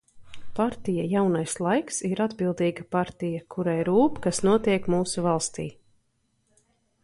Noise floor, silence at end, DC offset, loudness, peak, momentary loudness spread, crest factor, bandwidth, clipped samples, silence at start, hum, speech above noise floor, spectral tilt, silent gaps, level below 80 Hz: -71 dBFS; 1.3 s; under 0.1%; -26 LUFS; -10 dBFS; 8 LU; 16 dB; 11.5 kHz; under 0.1%; 0.15 s; none; 46 dB; -5.5 dB/octave; none; -56 dBFS